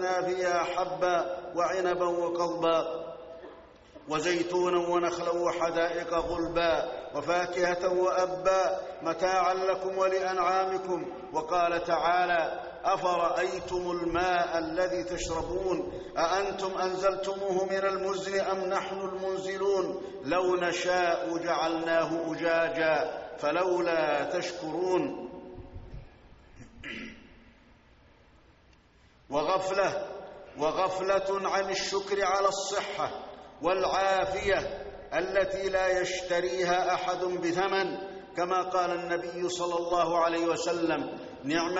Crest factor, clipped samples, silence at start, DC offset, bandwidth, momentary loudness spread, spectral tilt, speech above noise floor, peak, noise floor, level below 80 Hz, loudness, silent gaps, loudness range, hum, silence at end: 16 dB; under 0.1%; 0 s; under 0.1%; 8 kHz; 8 LU; -2.5 dB/octave; 32 dB; -14 dBFS; -60 dBFS; -56 dBFS; -29 LUFS; none; 5 LU; none; 0 s